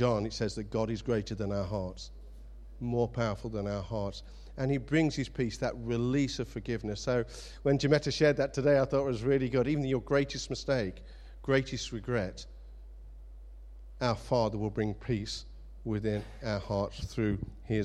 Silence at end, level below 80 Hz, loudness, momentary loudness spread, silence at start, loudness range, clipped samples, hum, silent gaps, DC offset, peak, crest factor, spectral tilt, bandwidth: 0 s; -48 dBFS; -32 LUFS; 23 LU; 0 s; 7 LU; under 0.1%; none; none; under 0.1%; -12 dBFS; 20 dB; -6 dB/octave; 12 kHz